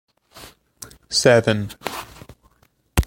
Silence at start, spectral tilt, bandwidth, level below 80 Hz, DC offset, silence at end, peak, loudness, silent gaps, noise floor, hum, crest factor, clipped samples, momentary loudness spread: 0.35 s; -4 dB/octave; 17 kHz; -40 dBFS; under 0.1%; 0 s; -2 dBFS; -19 LUFS; none; -61 dBFS; none; 22 dB; under 0.1%; 25 LU